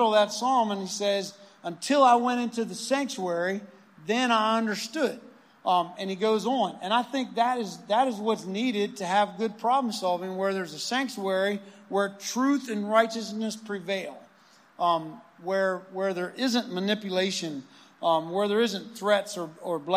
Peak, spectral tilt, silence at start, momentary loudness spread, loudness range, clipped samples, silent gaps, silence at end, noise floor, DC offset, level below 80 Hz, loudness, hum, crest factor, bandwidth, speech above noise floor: -8 dBFS; -4 dB/octave; 0 s; 9 LU; 3 LU; under 0.1%; none; 0 s; -58 dBFS; under 0.1%; -88 dBFS; -27 LUFS; none; 20 dB; 15.5 kHz; 31 dB